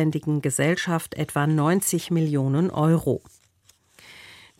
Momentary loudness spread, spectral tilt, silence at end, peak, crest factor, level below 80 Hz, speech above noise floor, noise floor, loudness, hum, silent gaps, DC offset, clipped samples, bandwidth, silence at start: 7 LU; -5.5 dB/octave; 0.25 s; -10 dBFS; 14 dB; -58 dBFS; 38 dB; -61 dBFS; -23 LUFS; none; none; under 0.1%; under 0.1%; 16.5 kHz; 0 s